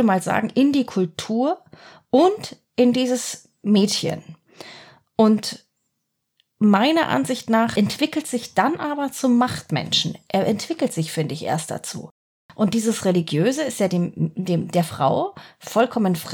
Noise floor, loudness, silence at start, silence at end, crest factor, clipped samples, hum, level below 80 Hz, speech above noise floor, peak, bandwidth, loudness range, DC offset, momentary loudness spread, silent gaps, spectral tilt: -76 dBFS; -21 LUFS; 0 s; 0 s; 18 dB; under 0.1%; none; -64 dBFS; 56 dB; -2 dBFS; 18.5 kHz; 3 LU; under 0.1%; 12 LU; 12.11-12.49 s; -5 dB/octave